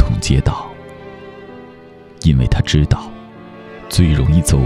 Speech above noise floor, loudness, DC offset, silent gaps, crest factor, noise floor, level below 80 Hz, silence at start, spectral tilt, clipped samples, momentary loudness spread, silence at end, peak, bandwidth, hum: 26 dB; -16 LUFS; under 0.1%; none; 16 dB; -39 dBFS; -24 dBFS; 0 s; -6 dB/octave; under 0.1%; 22 LU; 0 s; 0 dBFS; 14 kHz; none